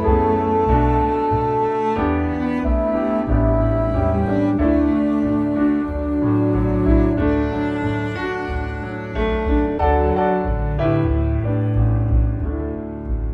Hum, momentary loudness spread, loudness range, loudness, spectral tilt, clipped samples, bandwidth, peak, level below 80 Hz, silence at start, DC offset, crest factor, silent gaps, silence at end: none; 7 LU; 2 LU; -19 LUFS; -10 dB/octave; under 0.1%; 6 kHz; -4 dBFS; -24 dBFS; 0 s; under 0.1%; 14 dB; none; 0 s